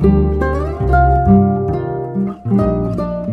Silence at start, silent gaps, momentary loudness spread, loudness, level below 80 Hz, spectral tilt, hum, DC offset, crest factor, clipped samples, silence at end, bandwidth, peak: 0 s; none; 9 LU; -15 LUFS; -22 dBFS; -11 dB/octave; none; under 0.1%; 14 dB; under 0.1%; 0 s; 5.2 kHz; 0 dBFS